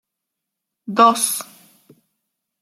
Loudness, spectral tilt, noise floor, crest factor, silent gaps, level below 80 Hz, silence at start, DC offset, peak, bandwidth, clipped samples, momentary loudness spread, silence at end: -17 LUFS; -2.5 dB/octave; -81 dBFS; 20 dB; none; -76 dBFS; 0.9 s; under 0.1%; -2 dBFS; 16 kHz; under 0.1%; 24 LU; 1.2 s